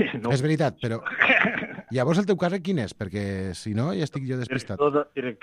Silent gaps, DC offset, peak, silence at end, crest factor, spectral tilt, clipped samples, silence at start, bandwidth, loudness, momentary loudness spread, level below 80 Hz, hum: none; under 0.1%; -4 dBFS; 0.1 s; 22 dB; -6 dB/octave; under 0.1%; 0 s; 12 kHz; -25 LUFS; 11 LU; -58 dBFS; none